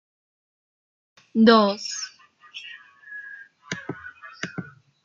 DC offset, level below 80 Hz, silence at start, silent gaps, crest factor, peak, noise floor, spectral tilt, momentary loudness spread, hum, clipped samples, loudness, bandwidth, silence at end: under 0.1%; -72 dBFS; 1.35 s; none; 24 dB; -2 dBFS; -50 dBFS; -4.5 dB/octave; 25 LU; none; under 0.1%; -22 LUFS; 7.6 kHz; 0.4 s